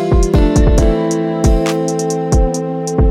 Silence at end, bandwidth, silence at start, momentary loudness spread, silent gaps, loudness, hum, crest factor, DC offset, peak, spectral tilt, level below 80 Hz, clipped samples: 0 s; 13 kHz; 0 s; 6 LU; none; -14 LUFS; none; 12 dB; under 0.1%; 0 dBFS; -6.5 dB/octave; -16 dBFS; under 0.1%